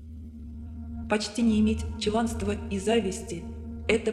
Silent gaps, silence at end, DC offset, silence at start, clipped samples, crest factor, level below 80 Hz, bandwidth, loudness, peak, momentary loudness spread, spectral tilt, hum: none; 0 s; under 0.1%; 0 s; under 0.1%; 20 dB; -40 dBFS; 12.5 kHz; -28 LUFS; -8 dBFS; 16 LU; -5.5 dB/octave; none